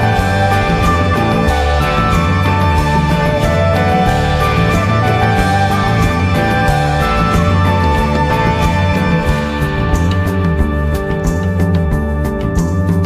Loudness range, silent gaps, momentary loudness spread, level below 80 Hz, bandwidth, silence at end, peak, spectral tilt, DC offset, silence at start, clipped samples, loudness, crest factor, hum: 2 LU; none; 4 LU; -20 dBFS; 15 kHz; 0 s; -2 dBFS; -6.5 dB/octave; under 0.1%; 0 s; under 0.1%; -13 LUFS; 12 dB; none